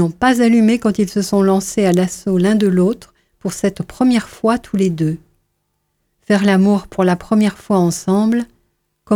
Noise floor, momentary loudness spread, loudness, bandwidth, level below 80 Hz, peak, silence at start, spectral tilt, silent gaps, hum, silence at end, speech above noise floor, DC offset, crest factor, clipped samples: -69 dBFS; 8 LU; -15 LUFS; 16 kHz; -48 dBFS; -2 dBFS; 0 s; -6 dB/octave; none; none; 0 s; 54 dB; under 0.1%; 14 dB; under 0.1%